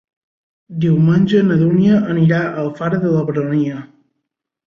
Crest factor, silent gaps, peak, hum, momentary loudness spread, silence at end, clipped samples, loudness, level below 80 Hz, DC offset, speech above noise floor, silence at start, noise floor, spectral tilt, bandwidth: 14 dB; none; -2 dBFS; none; 9 LU; 0.8 s; under 0.1%; -15 LUFS; -52 dBFS; under 0.1%; 62 dB; 0.7 s; -76 dBFS; -9.5 dB/octave; 6.4 kHz